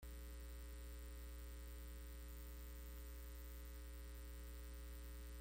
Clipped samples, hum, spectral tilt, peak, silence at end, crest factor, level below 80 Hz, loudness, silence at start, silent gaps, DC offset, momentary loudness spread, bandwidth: under 0.1%; none; -4.5 dB/octave; -44 dBFS; 0 s; 10 dB; -54 dBFS; -56 LUFS; 0 s; none; under 0.1%; 0 LU; 17 kHz